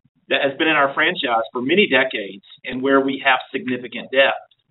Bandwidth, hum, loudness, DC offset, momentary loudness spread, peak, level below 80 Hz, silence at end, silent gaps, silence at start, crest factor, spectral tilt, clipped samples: 4.1 kHz; none; -18 LUFS; under 0.1%; 12 LU; -2 dBFS; -66 dBFS; 0.3 s; none; 0.3 s; 18 dB; -1 dB/octave; under 0.1%